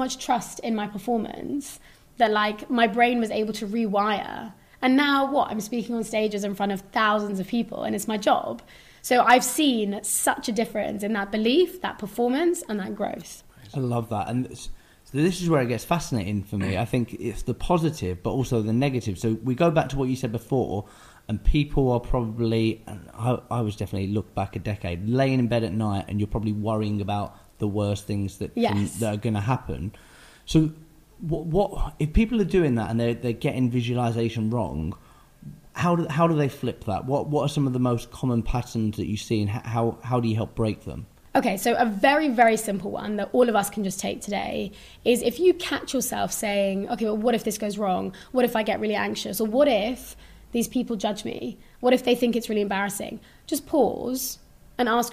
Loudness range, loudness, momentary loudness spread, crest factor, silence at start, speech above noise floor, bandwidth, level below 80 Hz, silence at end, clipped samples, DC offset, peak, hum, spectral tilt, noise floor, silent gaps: 4 LU; -25 LUFS; 10 LU; 20 dB; 0 s; 21 dB; 15.5 kHz; -40 dBFS; 0 s; under 0.1%; under 0.1%; -4 dBFS; none; -5.5 dB/octave; -45 dBFS; none